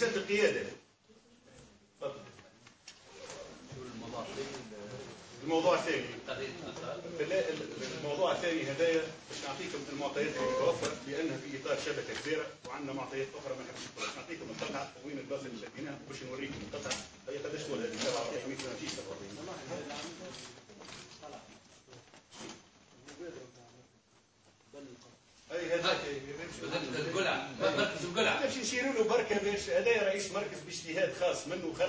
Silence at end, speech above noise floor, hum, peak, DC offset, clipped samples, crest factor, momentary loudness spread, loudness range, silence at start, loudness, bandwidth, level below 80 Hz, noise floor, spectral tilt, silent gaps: 0 s; 31 dB; none; -14 dBFS; under 0.1%; under 0.1%; 22 dB; 20 LU; 17 LU; 0 s; -35 LUFS; 8 kHz; -68 dBFS; -67 dBFS; -3.5 dB/octave; none